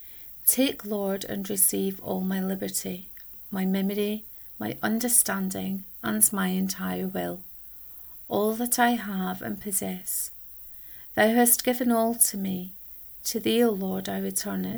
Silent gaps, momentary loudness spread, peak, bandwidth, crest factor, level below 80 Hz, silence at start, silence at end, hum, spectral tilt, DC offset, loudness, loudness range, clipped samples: none; 16 LU; -4 dBFS; over 20 kHz; 24 dB; -60 dBFS; 0 s; 0 s; none; -3.5 dB/octave; under 0.1%; -25 LUFS; 4 LU; under 0.1%